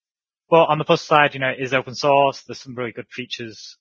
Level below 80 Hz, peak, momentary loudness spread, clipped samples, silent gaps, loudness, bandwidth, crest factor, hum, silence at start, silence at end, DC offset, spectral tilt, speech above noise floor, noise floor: -66 dBFS; 0 dBFS; 16 LU; under 0.1%; none; -19 LUFS; 7.4 kHz; 20 dB; none; 0.5 s; 0.1 s; under 0.1%; -5 dB/octave; 53 dB; -73 dBFS